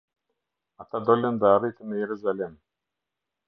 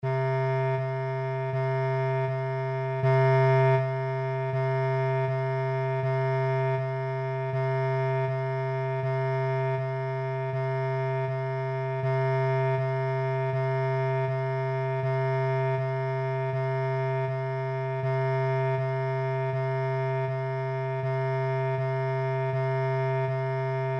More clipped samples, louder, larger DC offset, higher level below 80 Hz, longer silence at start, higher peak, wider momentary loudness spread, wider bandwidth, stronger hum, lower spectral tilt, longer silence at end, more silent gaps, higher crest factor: neither; first, -25 LUFS vs -28 LUFS; neither; about the same, -68 dBFS vs -70 dBFS; first, 0.8 s vs 0 s; first, -6 dBFS vs -14 dBFS; first, 12 LU vs 4 LU; second, 5.2 kHz vs 5.8 kHz; neither; about the same, -9.5 dB/octave vs -9 dB/octave; first, 0.95 s vs 0 s; neither; first, 22 dB vs 12 dB